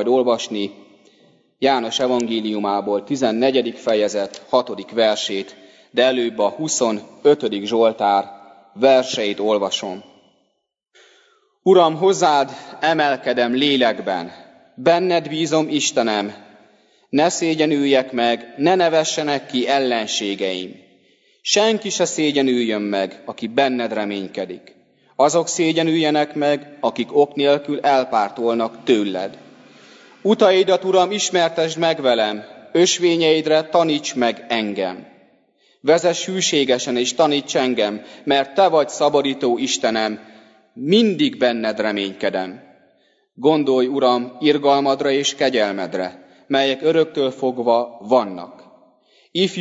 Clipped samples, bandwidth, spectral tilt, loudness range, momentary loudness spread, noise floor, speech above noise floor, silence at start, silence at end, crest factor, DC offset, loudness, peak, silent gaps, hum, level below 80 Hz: under 0.1%; 8 kHz; -3.5 dB/octave; 3 LU; 9 LU; -72 dBFS; 53 dB; 0 s; 0 s; 18 dB; under 0.1%; -18 LUFS; -2 dBFS; none; none; -70 dBFS